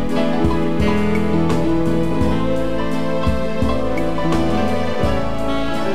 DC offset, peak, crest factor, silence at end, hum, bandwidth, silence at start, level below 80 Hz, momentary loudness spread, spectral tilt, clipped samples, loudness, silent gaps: 10%; -4 dBFS; 14 dB; 0 s; none; 15 kHz; 0 s; -30 dBFS; 3 LU; -7 dB/octave; under 0.1%; -19 LUFS; none